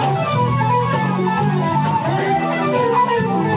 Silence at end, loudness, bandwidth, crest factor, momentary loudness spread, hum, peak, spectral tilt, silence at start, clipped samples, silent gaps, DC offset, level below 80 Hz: 0 s; -18 LUFS; 4 kHz; 12 dB; 2 LU; none; -6 dBFS; -11 dB/octave; 0 s; under 0.1%; none; under 0.1%; -48 dBFS